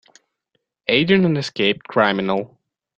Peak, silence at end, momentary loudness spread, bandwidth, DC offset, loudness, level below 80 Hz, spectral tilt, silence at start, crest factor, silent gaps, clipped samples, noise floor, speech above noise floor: -2 dBFS; 0.5 s; 10 LU; 8.4 kHz; under 0.1%; -19 LUFS; -58 dBFS; -6 dB/octave; 0.9 s; 20 dB; none; under 0.1%; -73 dBFS; 54 dB